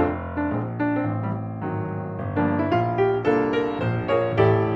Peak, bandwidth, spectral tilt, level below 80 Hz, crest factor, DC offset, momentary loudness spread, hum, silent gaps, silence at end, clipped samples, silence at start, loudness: -6 dBFS; 6 kHz; -9.5 dB/octave; -48 dBFS; 18 dB; under 0.1%; 9 LU; none; none; 0 s; under 0.1%; 0 s; -24 LUFS